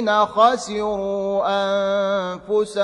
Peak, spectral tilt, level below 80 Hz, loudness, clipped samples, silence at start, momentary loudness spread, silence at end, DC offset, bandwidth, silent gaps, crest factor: -4 dBFS; -4.5 dB/octave; -56 dBFS; -20 LUFS; under 0.1%; 0 s; 7 LU; 0 s; under 0.1%; 11.5 kHz; none; 16 dB